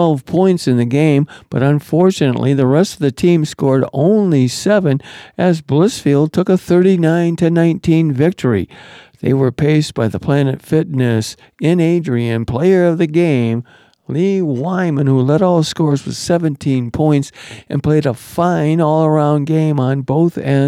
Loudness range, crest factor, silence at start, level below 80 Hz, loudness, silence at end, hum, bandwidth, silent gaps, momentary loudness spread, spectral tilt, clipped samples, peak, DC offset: 2 LU; 12 dB; 0 s; -48 dBFS; -14 LUFS; 0 s; none; 14 kHz; none; 6 LU; -7.5 dB/octave; under 0.1%; -2 dBFS; under 0.1%